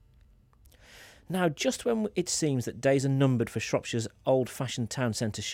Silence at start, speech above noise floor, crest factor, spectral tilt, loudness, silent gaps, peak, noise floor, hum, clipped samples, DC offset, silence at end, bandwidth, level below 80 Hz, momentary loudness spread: 0.9 s; 31 dB; 16 dB; -5 dB/octave; -29 LUFS; none; -14 dBFS; -59 dBFS; none; under 0.1%; under 0.1%; 0 s; 16.5 kHz; -62 dBFS; 7 LU